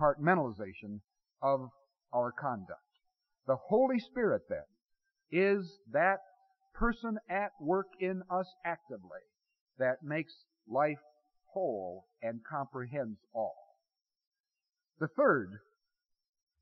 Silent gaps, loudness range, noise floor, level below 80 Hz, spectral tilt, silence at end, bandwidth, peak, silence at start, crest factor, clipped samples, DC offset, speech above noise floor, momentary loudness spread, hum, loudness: 9.61-9.66 s, 14.27-14.31 s, 14.40-14.44 s; 6 LU; under -90 dBFS; -56 dBFS; -6 dB/octave; 1.05 s; 6 kHz; -14 dBFS; 0 s; 20 dB; under 0.1%; under 0.1%; over 56 dB; 17 LU; none; -34 LUFS